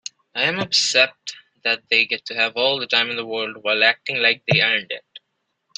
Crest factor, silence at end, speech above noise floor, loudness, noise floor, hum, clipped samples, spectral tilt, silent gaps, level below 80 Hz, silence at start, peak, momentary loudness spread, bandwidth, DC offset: 20 dB; 0.6 s; 54 dB; -18 LUFS; -74 dBFS; none; under 0.1%; -2 dB/octave; none; -66 dBFS; 0.35 s; 0 dBFS; 10 LU; 14 kHz; under 0.1%